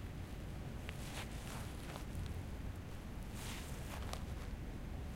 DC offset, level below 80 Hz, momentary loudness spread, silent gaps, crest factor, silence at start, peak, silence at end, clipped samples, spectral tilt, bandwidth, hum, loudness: under 0.1%; -50 dBFS; 3 LU; none; 22 dB; 0 s; -24 dBFS; 0 s; under 0.1%; -5 dB/octave; 16.5 kHz; none; -47 LUFS